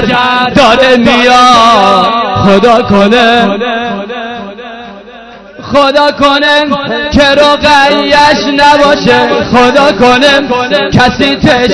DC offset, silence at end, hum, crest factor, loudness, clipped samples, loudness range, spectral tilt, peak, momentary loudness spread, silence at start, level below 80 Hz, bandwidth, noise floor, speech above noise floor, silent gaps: under 0.1%; 0 s; none; 6 dB; -6 LUFS; 9%; 5 LU; -4.5 dB/octave; 0 dBFS; 10 LU; 0 s; -32 dBFS; 11 kHz; -29 dBFS; 24 dB; none